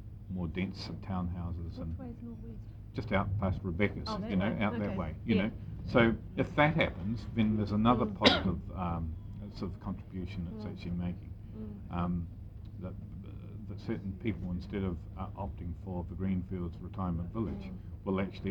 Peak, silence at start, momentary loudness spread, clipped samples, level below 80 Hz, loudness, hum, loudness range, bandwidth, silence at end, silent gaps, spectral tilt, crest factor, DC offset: -8 dBFS; 0 s; 16 LU; under 0.1%; -48 dBFS; -34 LUFS; none; 10 LU; 8.2 kHz; 0 s; none; -7 dB/octave; 26 dB; under 0.1%